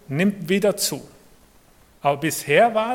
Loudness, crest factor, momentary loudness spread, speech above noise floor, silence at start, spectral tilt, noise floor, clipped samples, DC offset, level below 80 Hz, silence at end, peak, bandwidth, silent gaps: -21 LUFS; 20 dB; 8 LU; 33 dB; 0.1 s; -4 dB/octave; -53 dBFS; under 0.1%; under 0.1%; -60 dBFS; 0 s; -2 dBFS; 17.5 kHz; none